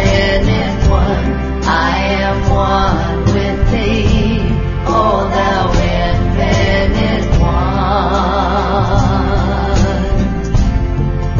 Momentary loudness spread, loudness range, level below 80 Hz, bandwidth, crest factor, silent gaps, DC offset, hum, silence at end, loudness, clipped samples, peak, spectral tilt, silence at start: 3 LU; 1 LU; -18 dBFS; 7.4 kHz; 12 dB; none; under 0.1%; none; 0 s; -14 LUFS; under 0.1%; 0 dBFS; -6.5 dB/octave; 0 s